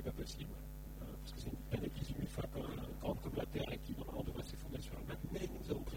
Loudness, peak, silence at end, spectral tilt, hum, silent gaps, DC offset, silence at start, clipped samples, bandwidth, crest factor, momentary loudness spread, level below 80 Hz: -45 LUFS; -26 dBFS; 0 s; -6 dB/octave; none; none; under 0.1%; 0 s; under 0.1%; 17 kHz; 18 dB; 7 LU; -50 dBFS